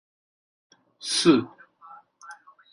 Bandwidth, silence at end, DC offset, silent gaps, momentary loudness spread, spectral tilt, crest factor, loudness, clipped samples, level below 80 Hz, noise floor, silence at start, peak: 11.5 kHz; 0.4 s; under 0.1%; none; 26 LU; -4 dB/octave; 22 dB; -22 LUFS; under 0.1%; -70 dBFS; -50 dBFS; 1.05 s; -6 dBFS